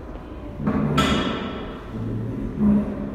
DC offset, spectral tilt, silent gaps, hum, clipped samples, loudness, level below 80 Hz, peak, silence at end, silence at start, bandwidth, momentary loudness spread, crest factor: under 0.1%; -6.5 dB/octave; none; none; under 0.1%; -24 LUFS; -36 dBFS; -6 dBFS; 0 s; 0 s; 14 kHz; 14 LU; 18 dB